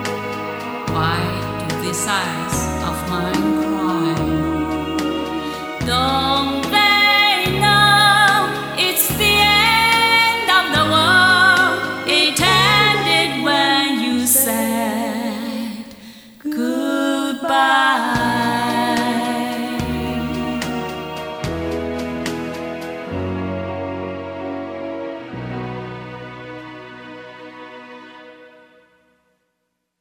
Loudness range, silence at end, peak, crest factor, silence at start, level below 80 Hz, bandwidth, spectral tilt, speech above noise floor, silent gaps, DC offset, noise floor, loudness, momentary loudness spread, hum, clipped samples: 16 LU; 1.55 s; 0 dBFS; 18 dB; 0 s; -42 dBFS; over 20 kHz; -3 dB/octave; 53 dB; none; under 0.1%; -73 dBFS; -16 LUFS; 17 LU; none; under 0.1%